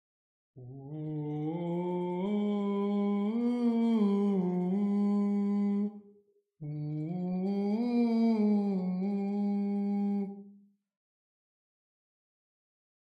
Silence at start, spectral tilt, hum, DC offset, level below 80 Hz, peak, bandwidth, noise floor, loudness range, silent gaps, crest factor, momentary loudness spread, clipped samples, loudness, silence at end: 0.55 s; -10 dB/octave; none; under 0.1%; -82 dBFS; -18 dBFS; 5.2 kHz; -66 dBFS; 6 LU; none; 14 dB; 11 LU; under 0.1%; -31 LUFS; 2.6 s